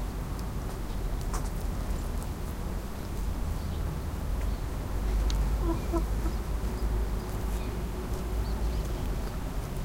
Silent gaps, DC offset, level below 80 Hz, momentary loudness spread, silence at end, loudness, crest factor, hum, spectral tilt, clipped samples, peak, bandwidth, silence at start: none; under 0.1%; -32 dBFS; 6 LU; 0 s; -34 LUFS; 16 dB; none; -6 dB/octave; under 0.1%; -14 dBFS; 16.5 kHz; 0 s